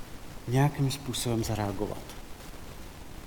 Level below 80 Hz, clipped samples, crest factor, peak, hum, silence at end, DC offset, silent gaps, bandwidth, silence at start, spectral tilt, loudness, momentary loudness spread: -46 dBFS; under 0.1%; 18 dB; -14 dBFS; none; 0 s; under 0.1%; none; 19 kHz; 0 s; -5.5 dB/octave; -30 LUFS; 19 LU